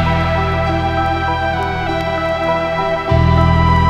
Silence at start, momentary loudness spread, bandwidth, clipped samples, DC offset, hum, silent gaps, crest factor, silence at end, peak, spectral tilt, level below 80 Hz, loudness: 0 s; 6 LU; 8.4 kHz; under 0.1%; under 0.1%; none; none; 14 dB; 0 s; 0 dBFS; -7.5 dB/octave; -24 dBFS; -16 LUFS